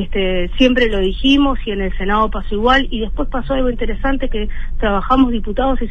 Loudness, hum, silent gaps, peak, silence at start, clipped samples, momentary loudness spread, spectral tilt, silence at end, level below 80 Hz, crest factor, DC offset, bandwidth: -17 LUFS; none; none; 0 dBFS; 0 s; under 0.1%; 9 LU; -6.5 dB/octave; 0 s; -20 dBFS; 14 dB; under 0.1%; 6.6 kHz